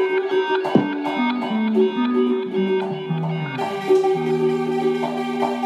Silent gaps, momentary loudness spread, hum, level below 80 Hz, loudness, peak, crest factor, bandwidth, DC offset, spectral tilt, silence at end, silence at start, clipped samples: none; 6 LU; none; -78 dBFS; -21 LUFS; -2 dBFS; 18 dB; 11 kHz; under 0.1%; -7 dB/octave; 0 s; 0 s; under 0.1%